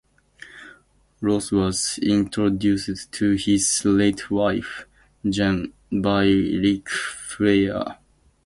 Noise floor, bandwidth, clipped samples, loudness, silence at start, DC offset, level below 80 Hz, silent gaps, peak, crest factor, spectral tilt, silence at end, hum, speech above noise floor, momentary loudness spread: -55 dBFS; 11.5 kHz; under 0.1%; -22 LUFS; 0.55 s; under 0.1%; -46 dBFS; none; -6 dBFS; 18 dB; -4.5 dB/octave; 0.5 s; none; 34 dB; 11 LU